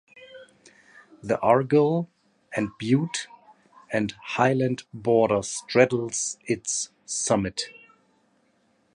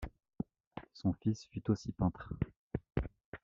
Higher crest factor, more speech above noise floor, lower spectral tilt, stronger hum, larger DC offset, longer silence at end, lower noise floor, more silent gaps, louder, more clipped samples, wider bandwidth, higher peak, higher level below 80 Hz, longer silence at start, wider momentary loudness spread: about the same, 22 dB vs 20 dB; first, 42 dB vs 17 dB; second, -4.5 dB/octave vs -8 dB/octave; neither; neither; first, 1.25 s vs 0.05 s; first, -66 dBFS vs -53 dBFS; second, none vs 0.67-0.71 s, 2.56-2.70 s, 3.25-3.32 s; first, -25 LUFS vs -39 LUFS; neither; first, 11.5 kHz vs 7.6 kHz; first, -4 dBFS vs -18 dBFS; second, -60 dBFS vs -52 dBFS; first, 0.15 s vs 0 s; about the same, 11 LU vs 13 LU